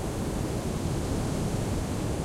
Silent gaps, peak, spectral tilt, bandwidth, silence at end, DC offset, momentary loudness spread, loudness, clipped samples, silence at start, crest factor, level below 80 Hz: none; -18 dBFS; -6 dB/octave; 16.5 kHz; 0 s; under 0.1%; 1 LU; -31 LUFS; under 0.1%; 0 s; 12 dB; -38 dBFS